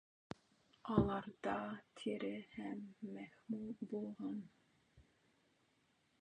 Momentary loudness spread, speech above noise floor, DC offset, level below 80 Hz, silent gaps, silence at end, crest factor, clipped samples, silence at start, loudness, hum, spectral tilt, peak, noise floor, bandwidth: 18 LU; 35 dB; under 0.1%; -64 dBFS; none; 1.2 s; 26 dB; under 0.1%; 0.85 s; -44 LUFS; none; -7.5 dB/octave; -18 dBFS; -78 dBFS; 9.4 kHz